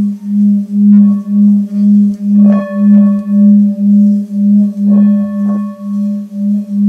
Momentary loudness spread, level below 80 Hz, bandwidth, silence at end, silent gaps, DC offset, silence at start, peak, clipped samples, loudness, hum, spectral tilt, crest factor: 8 LU; -66 dBFS; 2.6 kHz; 0 s; none; under 0.1%; 0 s; 0 dBFS; 0.1%; -10 LUFS; none; -11 dB/octave; 8 dB